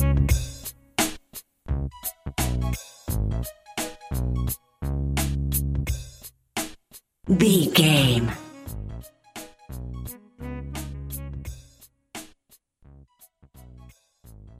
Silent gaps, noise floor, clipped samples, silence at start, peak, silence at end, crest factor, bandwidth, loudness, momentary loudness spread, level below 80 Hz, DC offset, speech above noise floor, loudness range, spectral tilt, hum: none; -60 dBFS; under 0.1%; 0 s; -4 dBFS; 0.05 s; 22 dB; 16 kHz; -26 LUFS; 22 LU; -34 dBFS; under 0.1%; 42 dB; 16 LU; -4.5 dB/octave; none